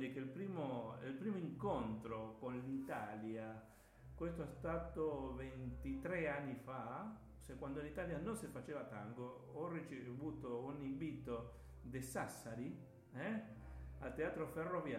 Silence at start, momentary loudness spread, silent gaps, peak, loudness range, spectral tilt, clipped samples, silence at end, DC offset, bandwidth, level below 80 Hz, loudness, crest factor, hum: 0 s; 9 LU; none; -30 dBFS; 3 LU; -7 dB/octave; under 0.1%; 0 s; under 0.1%; 16 kHz; -62 dBFS; -47 LUFS; 18 dB; none